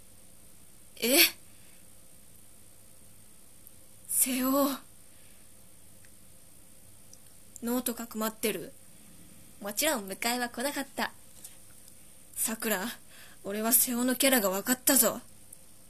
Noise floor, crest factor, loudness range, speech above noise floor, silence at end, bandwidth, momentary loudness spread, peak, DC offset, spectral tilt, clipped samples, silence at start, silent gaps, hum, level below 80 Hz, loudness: -57 dBFS; 26 dB; 10 LU; 28 dB; 0.65 s; 14.5 kHz; 21 LU; -6 dBFS; 0.3%; -1.5 dB/octave; under 0.1%; 0.95 s; none; none; -66 dBFS; -28 LUFS